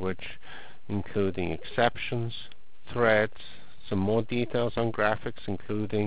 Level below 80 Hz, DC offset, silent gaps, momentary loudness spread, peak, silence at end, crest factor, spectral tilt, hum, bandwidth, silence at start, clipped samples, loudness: -50 dBFS; 2%; none; 20 LU; -8 dBFS; 0 s; 20 dB; -10 dB/octave; none; 4 kHz; 0 s; under 0.1%; -29 LUFS